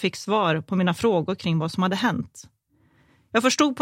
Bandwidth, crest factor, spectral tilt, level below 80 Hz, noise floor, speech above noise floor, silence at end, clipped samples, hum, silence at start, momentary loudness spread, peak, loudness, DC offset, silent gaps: 16 kHz; 20 dB; -5 dB/octave; -62 dBFS; -62 dBFS; 39 dB; 0 s; under 0.1%; none; 0 s; 5 LU; -4 dBFS; -23 LUFS; under 0.1%; none